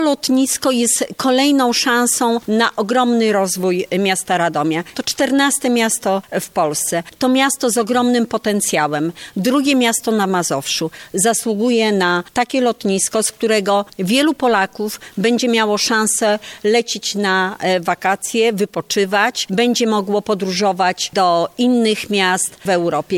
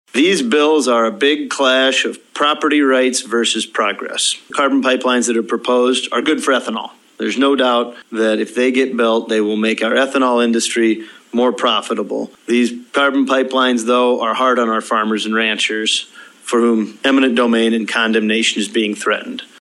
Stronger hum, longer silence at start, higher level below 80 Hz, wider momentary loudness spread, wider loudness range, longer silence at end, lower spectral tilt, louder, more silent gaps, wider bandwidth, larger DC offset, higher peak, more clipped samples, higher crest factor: neither; second, 0 s vs 0.15 s; first, -60 dBFS vs -70 dBFS; about the same, 5 LU vs 6 LU; about the same, 2 LU vs 2 LU; second, 0 s vs 0.15 s; about the same, -3 dB/octave vs -2.5 dB/octave; about the same, -16 LUFS vs -15 LUFS; neither; first, 17 kHz vs 12.5 kHz; neither; about the same, -2 dBFS vs 0 dBFS; neither; about the same, 14 dB vs 14 dB